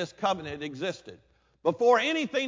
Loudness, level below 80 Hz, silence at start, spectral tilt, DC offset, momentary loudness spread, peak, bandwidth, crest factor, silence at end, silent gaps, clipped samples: -27 LUFS; -64 dBFS; 0 s; -4.5 dB/octave; under 0.1%; 13 LU; -10 dBFS; 7.6 kHz; 18 dB; 0 s; none; under 0.1%